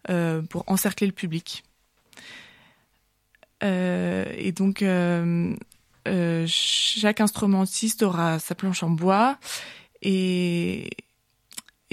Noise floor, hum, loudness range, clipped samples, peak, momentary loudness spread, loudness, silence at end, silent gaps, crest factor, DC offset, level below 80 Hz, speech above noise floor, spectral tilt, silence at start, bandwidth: -68 dBFS; none; 8 LU; under 0.1%; -8 dBFS; 18 LU; -24 LUFS; 0.3 s; none; 18 dB; under 0.1%; -62 dBFS; 44 dB; -4.5 dB/octave; 0.05 s; 16 kHz